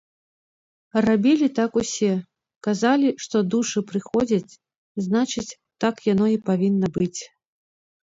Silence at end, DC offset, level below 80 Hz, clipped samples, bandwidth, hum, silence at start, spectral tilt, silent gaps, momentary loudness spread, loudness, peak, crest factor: 0.85 s; under 0.1%; -60 dBFS; under 0.1%; 7.8 kHz; none; 0.95 s; -5.5 dB/octave; 2.56-2.61 s, 4.76-4.95 s; 11 LU; -22 LUFS; -6 dBFS; 16 dB